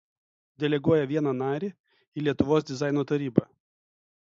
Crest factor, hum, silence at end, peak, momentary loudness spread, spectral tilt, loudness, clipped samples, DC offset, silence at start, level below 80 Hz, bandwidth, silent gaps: 24 dB; none; 0.9 s; -4 dBFS; 8 LU; -7.5 dB/octave; -27 LUFS; under 0.1%; under 0.1%; 0.6 s; -58 dBFS; 7.6 kHz; 1.80-1.84 s, 2.08-2.12 s